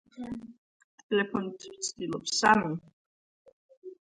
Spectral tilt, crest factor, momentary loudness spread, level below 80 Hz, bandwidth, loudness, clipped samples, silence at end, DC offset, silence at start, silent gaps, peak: -3.5 dB/octave; 24 dB; 19 LU; -66 dBFS; 11.5 kHz; -29 LUFS; under 0.1%; 0.1 s; under 0.1%; 0.15 s; 0.58-1.09 s, 2.93-3.45 s, 3.52-3.69 s, 3.77-3.82 s; -8 dBFS